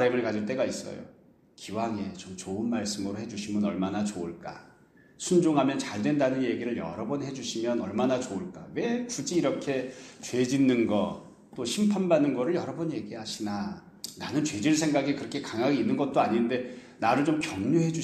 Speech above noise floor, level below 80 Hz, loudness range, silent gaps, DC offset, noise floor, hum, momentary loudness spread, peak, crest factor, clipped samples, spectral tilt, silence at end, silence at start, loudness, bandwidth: 30 dB; -66 dBFS; 5 LU; none; under 0.1%; -58 dBFS; none; 13 LU; -10 dBFS; 18 dB; under 0.1%; -5 dB/octave; 0 s; 0 s; -29 LUFS; 13.5 kHz